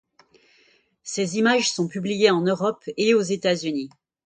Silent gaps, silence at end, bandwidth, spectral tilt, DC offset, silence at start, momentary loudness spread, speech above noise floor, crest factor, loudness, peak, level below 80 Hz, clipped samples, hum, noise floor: none; 0.4 s; 9.6 kHz; -4 dB/octave; under 0.1%; 1.05 s; 12 LU; 39 dB; 18 dB; -22 LUFS; -4 dBFS; -68 dBFS; under 0.1%; none; -61 dBFS